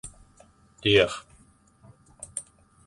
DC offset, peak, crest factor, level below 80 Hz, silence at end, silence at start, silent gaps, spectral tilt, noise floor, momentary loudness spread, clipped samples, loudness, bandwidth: under 0.1%; -6 dBFS; 24 dB; -54 dBFS; 0.45 s; 0.05 s; none; -3.5 dB/octave; -59 dBFS; 23 LU; under 0.1%; -25 LUFS; 11.5 kHz